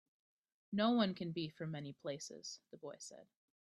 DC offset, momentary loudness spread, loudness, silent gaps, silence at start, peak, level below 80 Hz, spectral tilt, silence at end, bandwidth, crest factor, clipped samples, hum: under 0.1%; 18 LU; -41 LUFS; none; 0.7 s; -20 dBFS; -84 dBFS; -5 dB/octave; 0.4 s; 12 kHz; 22 dB; under 0.1%; none